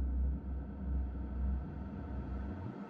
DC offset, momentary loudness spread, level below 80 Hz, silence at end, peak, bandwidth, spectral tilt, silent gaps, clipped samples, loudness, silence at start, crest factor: under 0.1%; 5 LU; -38 dBFS; 0 s; -26 dBFS; 3.4 kHz; -11 dB/octave; none; under 0.1%; -41 LUFS; 0 s; 12 dB